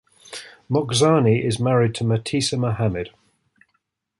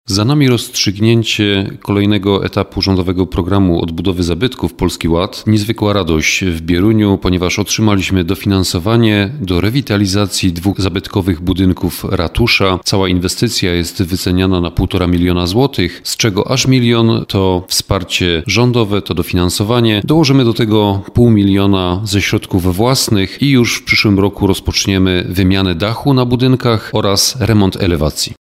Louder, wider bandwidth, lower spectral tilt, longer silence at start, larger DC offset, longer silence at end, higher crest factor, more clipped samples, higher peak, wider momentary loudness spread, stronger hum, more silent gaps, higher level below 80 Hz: second, -20 LUFS vs -13 LUFS; second, 11.5 kHz vs 16 kHz; about the same, -5.5 dB/octave vs -5 dB/octave; first, 0.3 s vs 0.1 s; neither; first, 1.1 s vs 0.05 s; first, 18 dB vs 12 dB; neither; second, -4 dBFS vs 0 dBFS; first, 19 LU vs 5 LU; neither; neither; second, -50 dBFS vs -32 dBFS